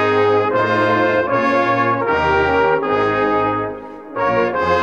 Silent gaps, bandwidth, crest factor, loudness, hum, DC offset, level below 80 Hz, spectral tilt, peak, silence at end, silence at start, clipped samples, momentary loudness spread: none; 7.6 kHz; 14 dB; -16 LUFS; none; 0.2%; -44 dBFS; -6.5 dB/octave; -2 dBFS; 0 s; 0 s; under 0.1%; 6 LU